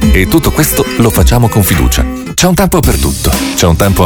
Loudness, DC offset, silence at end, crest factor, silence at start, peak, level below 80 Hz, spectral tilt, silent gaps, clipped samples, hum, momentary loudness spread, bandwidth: -9 LUFS; under 0.1%; 0 s; 8 dB; 0 s; 0 dBFS; -16 dBFS; -5 dB/octave; none; 0.5%; none; 3 LU; over 20 kHz